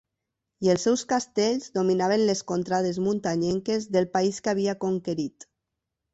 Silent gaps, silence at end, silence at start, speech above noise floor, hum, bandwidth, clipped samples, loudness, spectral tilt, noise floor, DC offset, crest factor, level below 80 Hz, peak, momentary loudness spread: none; 0.7 s; 0.6 s; 59 dB; none; 8.2 kHz; under 0.1%; -26 LUFS; -5 dB/octave; -84 dBFS; under 0.1%; 16 dB; -64 dBFS; -10 dBFS; 5 LU